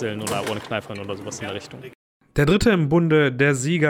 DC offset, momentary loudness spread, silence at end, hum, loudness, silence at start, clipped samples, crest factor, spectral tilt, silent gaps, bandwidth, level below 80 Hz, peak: under 0.1%; 14 LU; 0 s; none; -21 LUFS; 0 s; under 0.1%; 16 dB; -5.5 dB/octave; 1.95-2.20 s; 17 kHz; -42 dBFS; -6 dBFS